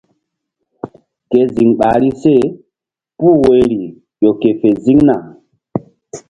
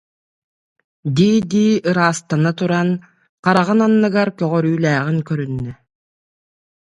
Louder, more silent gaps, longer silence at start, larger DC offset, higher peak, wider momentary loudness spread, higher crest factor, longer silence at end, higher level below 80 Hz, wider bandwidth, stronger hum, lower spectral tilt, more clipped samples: first, -12 LUFS vs -17 LUFS; second, none vs 3.29-3.43 s; second, 0.85 s vs 1.05 s; neither; about the same, 0 dBFS vs 0 dBFS; first, 20 LU vs 9 LU; about the same, 14 dB vs 18 dB; second, 0.1 s vs 1.1 s; first, -44 dBFS vs -54 dBFS; about the same, 10 kHz vs 11 kHz; neither; first, -8 dB/octave vs -6.5 dB/octave; neither